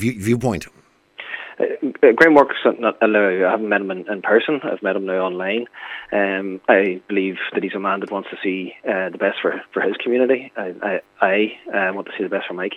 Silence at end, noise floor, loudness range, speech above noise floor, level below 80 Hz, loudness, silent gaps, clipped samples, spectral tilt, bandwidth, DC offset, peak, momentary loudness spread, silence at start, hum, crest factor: 0 s; -40 dBFS; 6 LU; 21 dB; -58 dBFS; -19 LUFS; none; under 0.1%; -6 dB/octave; 14 kHz; under 0.1%; 0 dBFS; 10 LU; 0 s; none; 20 dB